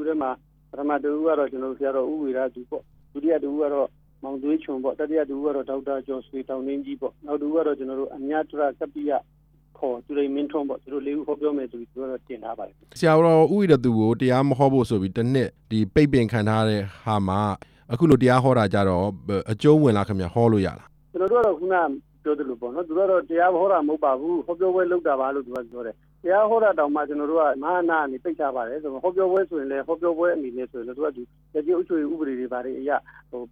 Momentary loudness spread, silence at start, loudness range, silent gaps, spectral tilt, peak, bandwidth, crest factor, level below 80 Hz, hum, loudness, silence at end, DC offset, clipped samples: 14 LU; 0 s; 7 LU; none; -8 dB/octave; -4 dBFS; 11.5 kHz; 18 dB; -54 dBFS; none; -23 LUFS; 0.05 s; under 0.1%; under 0.1%